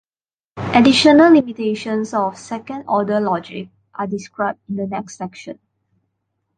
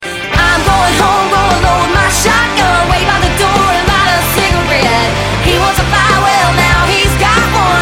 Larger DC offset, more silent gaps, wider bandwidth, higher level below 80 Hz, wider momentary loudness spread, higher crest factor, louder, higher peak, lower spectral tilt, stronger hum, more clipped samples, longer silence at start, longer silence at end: neither; neither; second, 9.4 kHz vs 16.5 kHz; second, -56 dBFS vs -20 dBFS; first, 20 LU vs 2 LU; first, 16 dB vs 10 dB; second, -17 LUFS vs -9 LUFS; about the same, -2 dBFS vs 0 dBFS; first, -5 dB/octave vs -3.5 dB/octave; neither; neither; first, 0.55 s vs 0 s; first, 1.05 s vs 0 s